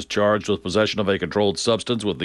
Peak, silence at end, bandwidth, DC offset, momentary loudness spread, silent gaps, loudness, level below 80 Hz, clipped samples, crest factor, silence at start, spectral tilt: -6 dBFS; 0 s; 11.5 kHz; under 0.1%; 3 LU; none; -21 LUFS; -52 dBFS; under 0.1%; 16 dB; 0 s; -4.5 dB/octave